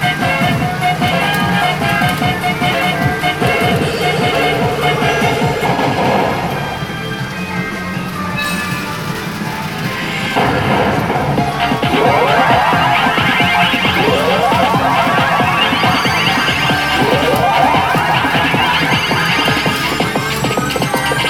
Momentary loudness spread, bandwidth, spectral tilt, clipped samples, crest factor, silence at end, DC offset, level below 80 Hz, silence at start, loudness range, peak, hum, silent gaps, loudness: 8 LU; 17.5 kHz; -4.5 dB/octave; under 0.1%; 14 dB; 0 s; under 0.1%; -38 dBFS; 0 s; 6 LU; 0 dBFS; none; none; -14 LUFS